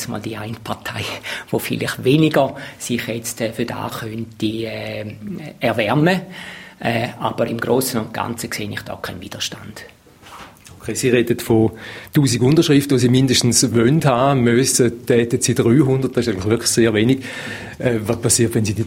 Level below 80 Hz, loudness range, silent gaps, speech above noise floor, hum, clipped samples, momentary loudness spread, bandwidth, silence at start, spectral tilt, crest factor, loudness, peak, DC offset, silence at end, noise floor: -48 dBFS; 9 LU; none; 22 dB; none; under 0.1%; 15 LU; 16.5 kHz; 0 s; -5 dB/octave; 18 dB; -18 LUFS; 0 dBFS; under 0.1%; 0 s; -40 dBFS